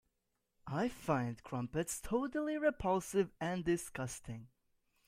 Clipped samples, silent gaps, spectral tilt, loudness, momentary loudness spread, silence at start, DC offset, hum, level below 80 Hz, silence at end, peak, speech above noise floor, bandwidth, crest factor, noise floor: under 0.1%; none; -5.5 dB/octave; -38 LUFS; 9 LU; 0.65 s; under 0.1%; none; -60 dBFS; 0.6 s; -20 dBFS; 47 dB; 16 kHz; 20 dB; -84 dBFS